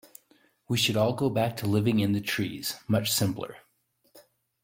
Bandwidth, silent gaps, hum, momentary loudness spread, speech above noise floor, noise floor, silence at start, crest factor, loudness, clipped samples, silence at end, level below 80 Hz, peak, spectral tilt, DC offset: 16.5 kHz; none; none; 7 LU; 43 dB; -70 dBFS; 0.7 s; 18 dB; -27 LUFS; under 0.1%; 0.45 s; -62 dBFS; -12 dBFS; -4.5 dB/octave; under 0.1%